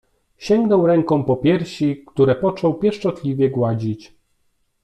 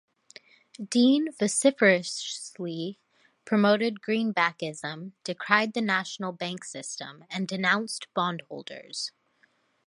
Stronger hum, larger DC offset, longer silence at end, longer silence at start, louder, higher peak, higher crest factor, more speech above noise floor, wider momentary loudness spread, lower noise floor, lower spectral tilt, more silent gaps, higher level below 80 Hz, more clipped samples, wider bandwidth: neither; neither; about the same, 0.8 s vs 0.75 s; second, 0.4 s vs 0.8 s; first, -19 LUFS vs -27 LUFS; about the same, -4 dBFS vs -4 dBFS; second, 16 dB vs 24 dB; first, 48 dB vs 40 dB; second, 8 LU vs 15 LU; about the same, -65 dBFS vs -67 dBFS; first, -8 dB/octave vs -4 dB/octave; neither; first, -52 dBFS vs -80 dBFS; neither; second, 9.6 kHz vs 11.5 kHz